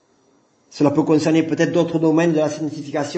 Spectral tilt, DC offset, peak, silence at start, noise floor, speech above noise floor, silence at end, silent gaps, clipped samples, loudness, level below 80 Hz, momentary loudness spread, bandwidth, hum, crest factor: -6.5 dB/octave; under 0.1%; -2 dBFS; 0.7 s; -59 dBFS; 41 dB; 0 s; none; under 0.1%; -18 LUFS; -64 dBFS; 8 LU; 8.6 kHz; none; 18 dB